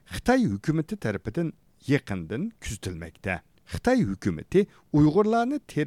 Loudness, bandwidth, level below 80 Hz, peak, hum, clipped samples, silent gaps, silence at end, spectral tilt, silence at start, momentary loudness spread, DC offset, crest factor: -26 LUFS; 14.5 kHz; -48 dBFS; -8 dBFS; none; under 0.1%; none; 0 s; -7 dB/octave; 0.1 s; 13 LU; under 0.1%; 18 dB